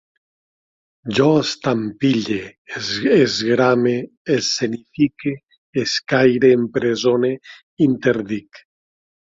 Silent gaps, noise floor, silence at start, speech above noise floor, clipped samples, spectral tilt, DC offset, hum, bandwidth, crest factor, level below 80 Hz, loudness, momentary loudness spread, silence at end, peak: 2.58-2.65 s, 4.17-4.25 s, 5.58-5.73 s, 7.63-7.77 s; under -90 dBFS; 1.05 s; over 72 dB; under 0.1%; -5 dB/octave; under 0.1%; none; 7.8 kHz; 16 dB; -58 dBFS; -18 LUFS; 11 LU; 0.7 s; -2 dBFS